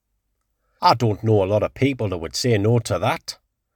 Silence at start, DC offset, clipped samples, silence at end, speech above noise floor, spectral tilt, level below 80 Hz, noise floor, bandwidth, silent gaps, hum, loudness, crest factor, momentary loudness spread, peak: 0.8 s; under 0.1%; under 0.1%; 0.4 s; 53 dB; -6 dB/octave; -50 dBFS; -73 dBFS; 18.5 kHz; none; none; -20 LUFS; 20 dB; 8 LU; -2 dBFS